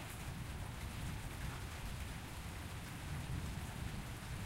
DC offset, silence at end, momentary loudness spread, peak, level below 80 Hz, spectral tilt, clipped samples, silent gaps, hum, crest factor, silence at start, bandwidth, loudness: under 0.1%; 0 s; 3 LU; -30 dBFS; -50 dBFS; -4.5 dB/octave; under 0.1%; none; none; 14 dB; 0 s; 16 kHz; -46 LUFS